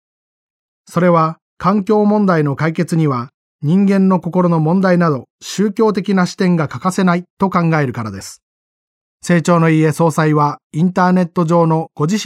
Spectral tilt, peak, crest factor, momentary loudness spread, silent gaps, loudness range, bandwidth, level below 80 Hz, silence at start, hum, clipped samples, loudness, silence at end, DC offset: -7 dB/octave; 0 dBFS; 14 dB; 9 LU; 1.42-1.57 s, 3.34-3.59 s, 5.30-5.39 s, 7.30-7.37 s, 8.43-9.20 s, 10.64-10.70 s; 2 LU; 13 kHz; -56 dBFS; 0.9 s; none; under 0.1%; -15 LUFS; 0 s; under 0.1%